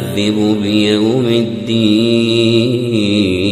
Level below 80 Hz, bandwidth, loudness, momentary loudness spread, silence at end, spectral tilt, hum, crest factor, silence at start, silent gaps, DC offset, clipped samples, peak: -50 dBFS; 14.5 kHz; -13 LUFS; 3 LU; 0 s; -6 dB/octave; none; 12 dB; 0 s; none; under 0.1%; under 0.1%; 0 dBFS